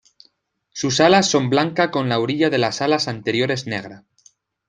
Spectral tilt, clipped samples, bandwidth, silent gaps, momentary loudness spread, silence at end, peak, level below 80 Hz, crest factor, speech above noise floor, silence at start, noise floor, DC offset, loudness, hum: -4.5 dB/octave; under 0.1%; 9.6 kHz; none; 13 LU; 0.7 s; -2 dBFS; -60 dBFS; 18 dB; 44 dB; 0.75 s; -63 dBFS; under 0.1%; -19 LUFS; none